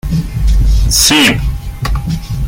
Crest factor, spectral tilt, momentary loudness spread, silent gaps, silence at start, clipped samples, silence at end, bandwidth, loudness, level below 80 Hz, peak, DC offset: 12 dB; -3 dB/octave; 12 LU; none; 0.05 s; under 0.1%; 0 s; 17 kHz; -12 LUFS; -14 dBFS; 0 dBFS; under 0.1%